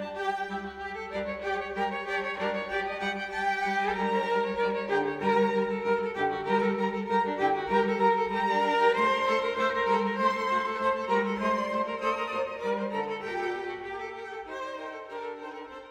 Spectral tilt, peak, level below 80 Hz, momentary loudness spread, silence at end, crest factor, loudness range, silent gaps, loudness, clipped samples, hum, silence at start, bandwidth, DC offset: -5.5 dB/octave; -12 dBFS; -60 dBFS; 12 LU; 0 s; 18 dB; 6 LU; none; -29 LUFS; under 0.1%; none; 0 s; 11 kHz; under 0.1%